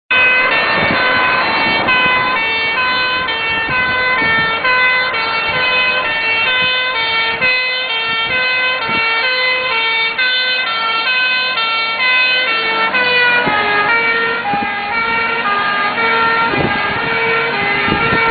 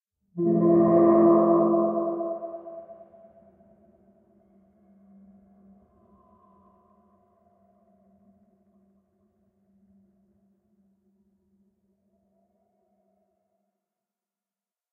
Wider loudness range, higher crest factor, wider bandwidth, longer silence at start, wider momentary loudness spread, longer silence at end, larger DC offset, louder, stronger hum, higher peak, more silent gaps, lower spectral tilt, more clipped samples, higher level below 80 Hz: second, 2 LU vs 25 LU; second, 14 dB vs 20 dB; first, 4.9 kHz vs 2.3 kHz; second, 0.1 s vs 0.35 s; second, 4 LU vs 24 LU; second, 0 s vs 12 s; neither; first, -13 LUFS vs -21 LUFS; neither; first, 0 dBFS vs -8 dBFS; neither; about the same, -8 dB/octave vs -8 dB/octave; neither; first, -46 dBFS vs -72 dBFS